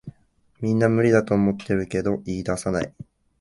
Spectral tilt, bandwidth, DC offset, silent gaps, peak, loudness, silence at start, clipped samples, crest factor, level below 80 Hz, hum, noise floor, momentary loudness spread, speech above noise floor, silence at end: -7 dB/octave; 11.5 kHz; under 0.1%; none; -4 dBFS; -23 LUFS; 0.05 s; under 0.1%; 20 dB; -48 dBFS; none; -60 dBFS; 9 LU; 39 dB; 0.5 s